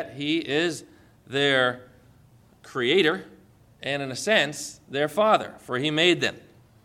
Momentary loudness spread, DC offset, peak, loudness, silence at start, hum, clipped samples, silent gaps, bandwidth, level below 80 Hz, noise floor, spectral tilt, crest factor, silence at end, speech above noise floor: 13 LU; under 0.1%; -6 dBFS; -24 LUFS; 0 s; none; under 0.1%; none; 16 kHz; -66 dBFS; -56 dBFS; -4 dB/octave; 20 dB; 0.45 s; 31 dB